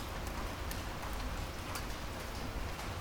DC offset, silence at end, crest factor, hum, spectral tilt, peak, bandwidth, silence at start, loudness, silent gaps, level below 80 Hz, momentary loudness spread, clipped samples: under 0.1%; 0 s; 18 dB; none; -4 dB/octave; -22 dBFS; over 20 kHz; 0 s; -41 LUFS; none; -44 dBFS; 1 LU; under 0.1%